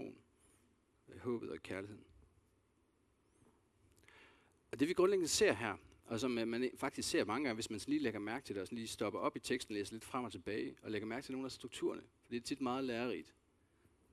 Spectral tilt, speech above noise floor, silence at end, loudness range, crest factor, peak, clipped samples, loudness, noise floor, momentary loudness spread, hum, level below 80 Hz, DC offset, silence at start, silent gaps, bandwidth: -4 dB/octave; 36 dB; 0.85 s; 13 LU; 22 dB; -18 dBFS; under 0.1%; -40 LUFS; -76 dBFS; 14 LU; none; -72 dBFS; under 0.1%; 0 s; none; 13.5 kHz